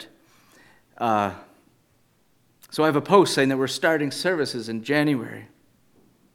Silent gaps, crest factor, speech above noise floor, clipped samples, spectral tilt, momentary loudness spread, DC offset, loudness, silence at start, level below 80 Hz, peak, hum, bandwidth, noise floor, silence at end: none; 24 dB; 42 dB; under 0.1%; -5 dB/octave; 14 LU; under 0.1%; -22 LUFS; 0 s; -72 dBFS; -2 dBFS; none; 17 kHz; -64 dBFS; 0.9 s